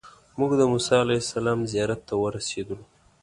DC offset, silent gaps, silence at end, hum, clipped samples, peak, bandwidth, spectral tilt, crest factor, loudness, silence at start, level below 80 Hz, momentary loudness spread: under 0.1%; none; 0.4 s; none; under 0.1%; -6 dBFS; 11.5 kHz; -5 dB/octave; 20 dB; -25 LUFS; 0.05 s; -54 dBFS; 13 LU